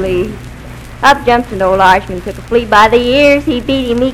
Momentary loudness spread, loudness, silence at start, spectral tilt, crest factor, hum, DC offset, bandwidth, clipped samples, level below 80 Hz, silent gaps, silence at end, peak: 17 LU; -10 LUFS; 0 s; -5 dB/octave; 10 dB; none; under 0.1%; 19 kHz; 2%; -30 dBFS; none; 0 s; 0 dBFS